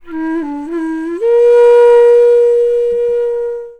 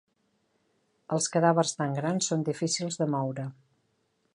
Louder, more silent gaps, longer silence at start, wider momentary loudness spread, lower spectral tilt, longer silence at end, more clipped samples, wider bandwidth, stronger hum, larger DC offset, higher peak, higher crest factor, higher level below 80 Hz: first, -11 LUFS vs -28 LUFS; neither; second, 0.05 s vs 1.1 s; first, 13 LU vs 9 LU; about the same, -5 dB/octave vs -4.5 dB/octave; second, 0.1 s vs 0.85 s; neither; second, 8.4 kHz vs 11.5 kHz; neither; neither; first, 0 dBFS vs -8 dBFS; second, 10 dB vs 22 dB; first, -48 dBFS vs -76 dBFS